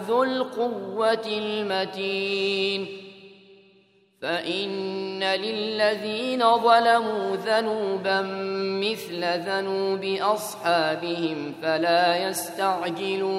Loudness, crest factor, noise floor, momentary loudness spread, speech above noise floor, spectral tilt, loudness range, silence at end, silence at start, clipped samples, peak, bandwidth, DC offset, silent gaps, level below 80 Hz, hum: -25 LUFS; 20 dB; -60 dBFS; 8 LU; 36 dB; -4 dB/octave; 6 LU; 0 s; 0 s; under 0.1%; -6 dBFS; 15.5 kHz; under 0.1%; none; -78 dBFS; none